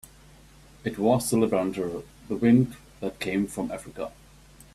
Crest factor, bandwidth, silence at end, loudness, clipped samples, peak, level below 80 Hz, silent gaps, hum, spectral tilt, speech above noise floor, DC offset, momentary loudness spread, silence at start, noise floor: 20 dB; 14.5 kHz; 0.65 s; -26 LUFS; under 0.1%; -8 dBFS; -54 dBFS; none; none; -6 dB/octave; 27 dB; under 0.1%; 15 LU; 0.85 s; -52 dBFS